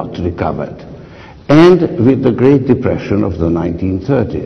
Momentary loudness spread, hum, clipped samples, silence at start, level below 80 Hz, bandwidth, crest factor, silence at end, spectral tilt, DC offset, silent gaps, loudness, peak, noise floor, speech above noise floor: 13 LU; none; under 0.1%; 0 s; -36 dBFS; 6.6 kHz; 12 dB; 0 s; -8.5 dB/octave; under 0.1%; none; -12 LUFS; 0 dBFS; -34 dBFS; 23 dB